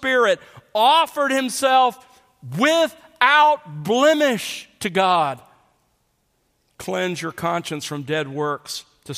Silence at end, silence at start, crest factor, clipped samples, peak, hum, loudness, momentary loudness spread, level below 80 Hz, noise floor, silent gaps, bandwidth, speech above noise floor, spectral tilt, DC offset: 0 s; 0 s; 20 dB; under 0.1%; 0 dBFS; none; -19 LUFS; 13 LU; -66 dBFS; -67 dBFS; none; 15.5 kHz; 48 dB; -3.5 dB/octave; under 0.1%